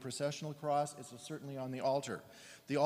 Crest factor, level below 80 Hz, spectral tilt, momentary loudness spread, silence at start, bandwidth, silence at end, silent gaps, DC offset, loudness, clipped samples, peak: 18 dB; -82 dBFS; -5 dB/octave; 12 LU; 0 s; 15.5 kHz; 0 s; none; under 0.1%; -39 LUFS; under 0.1%; -20 dBFS